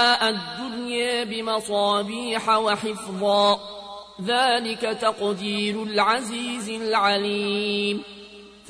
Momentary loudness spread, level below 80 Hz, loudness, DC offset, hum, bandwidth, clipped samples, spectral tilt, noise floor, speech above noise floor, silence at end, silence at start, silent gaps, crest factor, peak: 11 LU; -62 dBFS; -23 LUFS; under 0.1%; none; 11 kHz; under 0.1%; -3.5 dB/octave; -44 dBFS; 21 dB; 0 s; 0 s; none; 16 dB; -8 dBFS